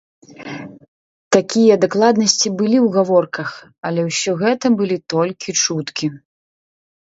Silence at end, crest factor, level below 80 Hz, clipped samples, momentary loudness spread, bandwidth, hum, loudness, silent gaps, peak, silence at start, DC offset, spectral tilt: 0.85 s; 18 dB; -64 dBFS; under 0.1%; 15 LU; 8 kHz; none; -16 LUFS; 0.88-1.31 s, 3.78-3.83 s; 0 dBFS; 0.4 s; under 0.1%; -4 dB/octave